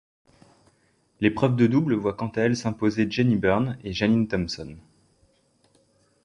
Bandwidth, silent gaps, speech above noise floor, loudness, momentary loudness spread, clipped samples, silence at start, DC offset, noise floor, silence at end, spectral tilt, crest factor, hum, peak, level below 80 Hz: 10.5 kHz; none; 42 dB; -24 LUFS; 8 LU; under 0.1%; 1.2 s; under 0.1%; -65 dBFS; 1.45 s; -7 dB/octave; 20 dB; none; -6 dBFS; -52 dBFS